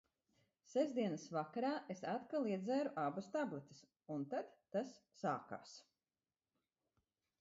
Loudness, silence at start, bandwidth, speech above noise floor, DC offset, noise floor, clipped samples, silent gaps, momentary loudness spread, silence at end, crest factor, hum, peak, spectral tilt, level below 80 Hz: -43 LUFS; 0.7 s; 7.6 kHz; over 47 dB; under 0.1%; under -90 dBFS; under 0.1%; none; 13 LU; 1.6 s; 18 dB; none; -26 dBFS; -5.5 dB/octave; -90 dBFS